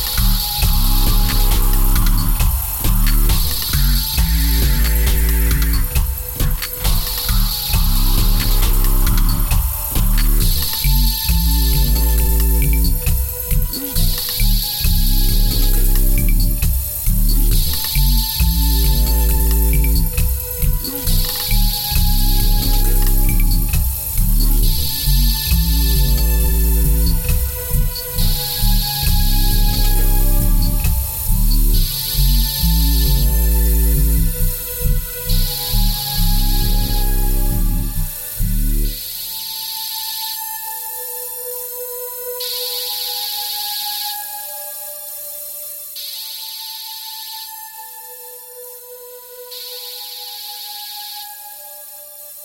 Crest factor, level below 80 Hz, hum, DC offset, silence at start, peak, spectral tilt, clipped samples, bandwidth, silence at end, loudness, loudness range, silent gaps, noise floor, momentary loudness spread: 12 dB; -16 dBFS; none; under 0.1%; 0 s; -4 dBFS; -3.5 dB/octave; under 0.1%; 19.5 kHz; 0 s; -18 LUFS; 9 LU; none; -36 dBFS; 11 LU